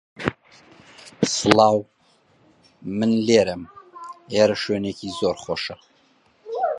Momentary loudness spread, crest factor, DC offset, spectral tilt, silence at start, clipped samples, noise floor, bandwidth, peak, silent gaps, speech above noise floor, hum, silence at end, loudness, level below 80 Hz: 22 LU; 24 dB; under 0.1%; -4.5 dB/octave; 0.2 s; under 0.1%; -60 dBFS; 11.5 kHz; 0 dBFS; none; 40 dB; none; 0 s; -21 LUFS; -56 dBFS